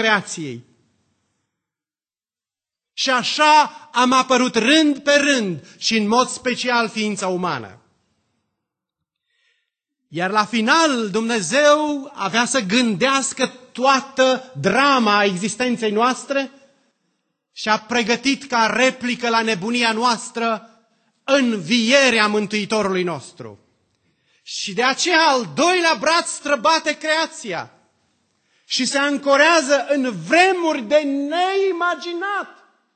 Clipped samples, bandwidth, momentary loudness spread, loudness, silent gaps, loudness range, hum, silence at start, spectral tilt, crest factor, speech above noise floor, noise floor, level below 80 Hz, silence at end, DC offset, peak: under 0.1%; 9.2 kHz; 10 LU; -18 LUFS; none; 5 LU; none; 0 s; -3 dB/octave; 20 dB; over 72 dB; under -90 dBFS; -66 dBFS; 0.45 s; under 0.1%; 0 dBFS